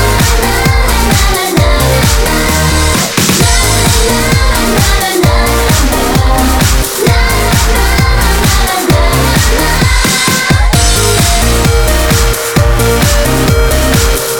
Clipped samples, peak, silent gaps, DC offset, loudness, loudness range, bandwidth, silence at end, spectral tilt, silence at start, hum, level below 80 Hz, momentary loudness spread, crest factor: under 0.1%; 0 dBFS; none; under 0.1%; -9 LUFS; 1 LU; over 20 kHz; 0 s; -4 dB/octave; 0 s; none; -12 dBFS; 2 LU; 8 dB